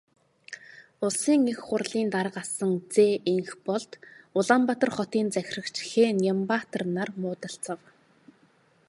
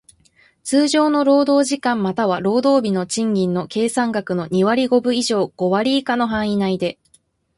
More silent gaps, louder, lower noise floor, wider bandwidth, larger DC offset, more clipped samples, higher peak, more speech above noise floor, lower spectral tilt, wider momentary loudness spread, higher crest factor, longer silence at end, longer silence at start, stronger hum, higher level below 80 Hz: neither; second, -27 LUFS vs -18 LUFS; first, -63 dBFS vs -59 dBFS; about the same, 11.5 kHz vs 11.5 kHz; neither; neither; about the same, -6 dBFS vs -4 dBFS; second, 37 dB vs 41 dB; about the same, -4.5 dB/octave vs -5 dB/octave; first, 14 LU vs 6 LU; first, 22 dB vs 14 dB; first, 1.15 s vs 0.65 s; second, 0.5 s vs 0.65 s; neither; second, -74 dBFS vs -56 dBFS